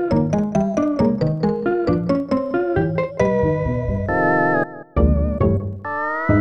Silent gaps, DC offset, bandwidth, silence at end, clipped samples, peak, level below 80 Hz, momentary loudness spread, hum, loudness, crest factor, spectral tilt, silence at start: none; under 0.1%; 7.2 kHz; 0 s; under 0.1%; -4 dBFS; -30 dBFS; 4 LU; none; -20 LUFS; 16 dB; -9 dB/octave; 0 s